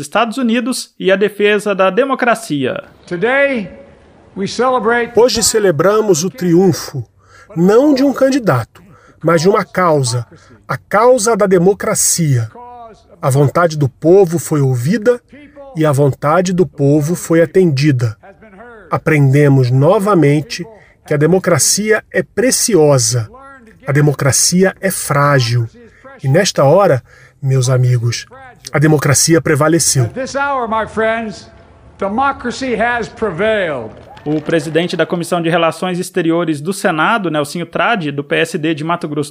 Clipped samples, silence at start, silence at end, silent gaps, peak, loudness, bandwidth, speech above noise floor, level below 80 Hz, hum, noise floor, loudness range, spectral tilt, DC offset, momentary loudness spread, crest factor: under 0.1%; 0 s; 0 s; none; -2 dBFS; -13 LUFS; 16 kHz; 30 dB; -48 dBFS; none; -43 dBFS; 4 LU; -5 dB/octave; under 0.1%; 11 LU; 12 dB